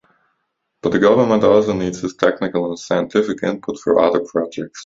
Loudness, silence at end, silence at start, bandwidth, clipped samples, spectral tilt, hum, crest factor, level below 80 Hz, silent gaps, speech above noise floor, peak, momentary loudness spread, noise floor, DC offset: -17 LUFS; 0 s; 0.85 s; 7.8 kHz; under 0.1%; -6 dB/octave; none; 18 dB; -52 dBFS; none; 55 dB; 0 dBFS; 10 LU; -72 dBFS; under 0.1%